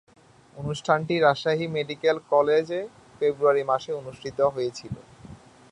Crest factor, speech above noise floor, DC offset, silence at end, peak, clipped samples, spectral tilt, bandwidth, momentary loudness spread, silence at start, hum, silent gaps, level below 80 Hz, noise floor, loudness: 20 dB; 23 dB; under 0.1%; 0.35 s; -6 dBFS; under 0.1%; -5.5 dB/octave; 10.5 kHz; 14 LU; 0.55 s; none; none; -60 dBFS; -47 dBFS; -25 LUFS